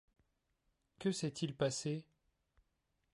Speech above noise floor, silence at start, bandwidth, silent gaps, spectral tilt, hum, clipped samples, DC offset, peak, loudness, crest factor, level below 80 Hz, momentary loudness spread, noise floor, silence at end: 45 dB; 1 s; 11.5 kHz; none; -5 dB/octave; none; under 0.1%; under 0.1%; -22 dBFS; -40 LUFS; 20 dB; -74 dBFS; 5 LU; -83 dBFS; 1.15 s